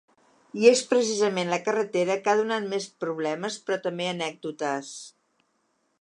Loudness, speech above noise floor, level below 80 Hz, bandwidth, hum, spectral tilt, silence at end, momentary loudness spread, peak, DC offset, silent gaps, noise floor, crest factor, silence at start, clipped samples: -26 LUFS; 47 dB; -82 dBFS; 11 kHz; none; -3.5 dB/octave; 0.9 s; 12 LU; -6 dBFS; under 0.1%; none; -72 dBFS; 22 dB; 0.55 s; under 0.1%